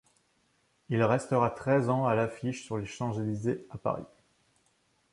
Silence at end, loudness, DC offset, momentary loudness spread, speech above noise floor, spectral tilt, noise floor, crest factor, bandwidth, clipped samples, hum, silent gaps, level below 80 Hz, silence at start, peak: 1.05 s; -30 LUFS; under 0.1%; 9 LU; 42 dB; -7 dB/octave; -71 dBFS; 20 dB; 11.5 kHz; under 0.1%; none; none; -64 dBFS; 0.9 s; -12 dBFS